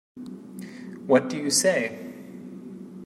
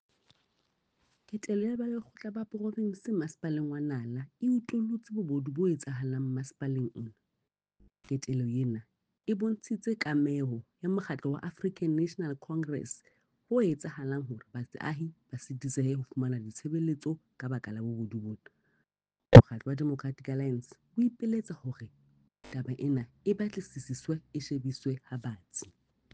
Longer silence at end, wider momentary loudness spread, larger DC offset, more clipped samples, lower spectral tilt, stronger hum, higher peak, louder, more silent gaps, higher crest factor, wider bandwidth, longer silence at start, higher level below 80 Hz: second, 0 s vs 0.45 s; first, 20 LU vs 11 LU; neither; neither; second, -3 dB/octave vs -7.5 dB/octave; neither; about the same, -4 dBFS vs -4 dBFS; first, -23 LUFS vs -31 LUFS; neither; second, 22 dB vs 28 dB; first, 16 kHz vs 9.4 kHz; second, 0.15 s vs 1.3 s; second, -74 dBFS vs -50 dBFS